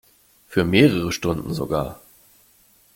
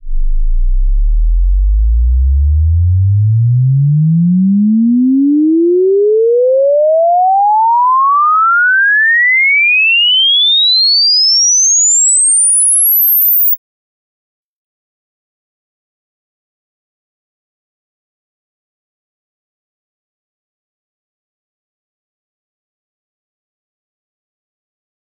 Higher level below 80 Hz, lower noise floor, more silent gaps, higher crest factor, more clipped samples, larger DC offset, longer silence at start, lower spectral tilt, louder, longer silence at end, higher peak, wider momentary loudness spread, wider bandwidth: second, -48 dBFS vs -20 dBFS; second, -56 dBFS vs under -90 dBFS; neither; first, 20 dB vs 6 dB; neither; neither; first, 0.5 s vs 0.05 s; first, -6 dB/octave vs -3 dB/octave; second, -21 LUFS vs -8 LUFS; second, 1 s vs 11.45 s; about the same, -2 dBFS vs -4 dBFS; about the same, 10 LU vs 9 LU; first, 17 kHz vs 6.8 kHz